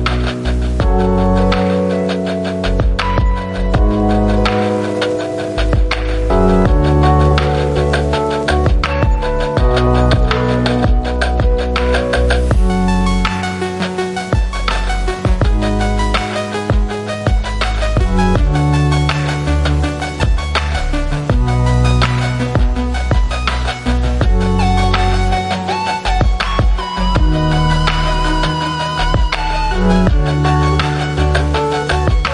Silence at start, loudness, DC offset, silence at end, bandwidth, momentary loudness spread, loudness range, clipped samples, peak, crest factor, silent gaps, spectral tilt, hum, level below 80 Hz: 0 s; -15 LUFS; under 0.1%; 0 s; 11 kHz; 5 LU; 3 LU; under 0.1%; 0 dBFS; 12 dB; none; -6.5 dB/octave; none; -18 dBFS